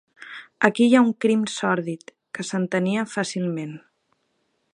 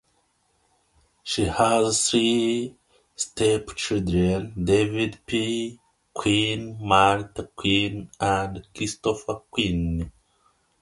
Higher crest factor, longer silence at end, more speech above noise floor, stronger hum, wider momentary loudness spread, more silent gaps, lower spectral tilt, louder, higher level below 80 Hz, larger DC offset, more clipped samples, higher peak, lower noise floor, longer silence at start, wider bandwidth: about the same, 22 dB vs 22 dB; first, 0.95 s vs 0.7 s; first, 50 dB vs 44 dB; neither; first, 21 LU vs 11 LU; neither; first, -5.5 dB/octave vs -4 dB/octave; about the same, -22 LUFS vs -24 LUFS; second, -74 dBFS vs -44 dBFS; neither; neither; first, 0 dBFS vs -4 dBFS; about the same, -71 dBFS vs -68 dBFS; second, 0.2 s vs 1.25 s; about the same, 10.5 kHz vs 11.5 kHz